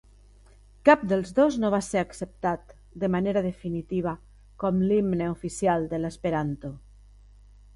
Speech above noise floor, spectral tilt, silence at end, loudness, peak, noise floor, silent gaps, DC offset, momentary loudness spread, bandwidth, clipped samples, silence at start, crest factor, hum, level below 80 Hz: 28 dB; -6.5 dB/octave; 1 s; -26 LUFS; -4 dBFS; -53 dBFS; none; under 0.1%; 12 LU; 11.5 kHz; under 0.1%; 0.85 s; 24 dB; 50 Hz at -50 dBFS; -50 dBFS